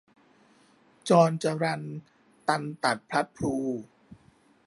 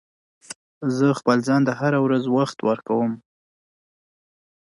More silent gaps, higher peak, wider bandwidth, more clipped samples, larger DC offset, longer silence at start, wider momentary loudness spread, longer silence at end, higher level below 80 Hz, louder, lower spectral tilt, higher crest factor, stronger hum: second, none vs 0.56-0.81 s; about the same, -6 dBFS vs -4 dBFS; about the same, 11.5 kHz vs 11.5 kHz; neither; neither; first, 1.05 s vs 0.5 s; about the same, 17 LU vs 18 LU; second, 0.55 s vs 1.5 s; first, -62 dBFS vs -70 dBFS; second, -27 LUFS vs -21 LUFS; about the same, -5.5 dB/octave vs -6.5 dB/octave; about the same, 22 dB vs 18 dB; neither